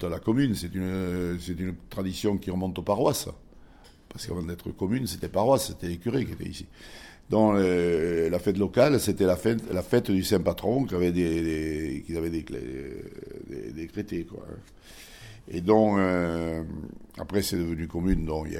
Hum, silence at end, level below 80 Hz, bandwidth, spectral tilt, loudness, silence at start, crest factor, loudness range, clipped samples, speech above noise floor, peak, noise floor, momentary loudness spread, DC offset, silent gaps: none; 0 s; -44 dBFS; 17.5 kHz; -6 dB/octave; -27 LUFS; 0 s; 20 dB; 7 LU; under 0.1%; 25 dB; -8 dBFS; -52 dBFS; 18 LU; under 0.1%; none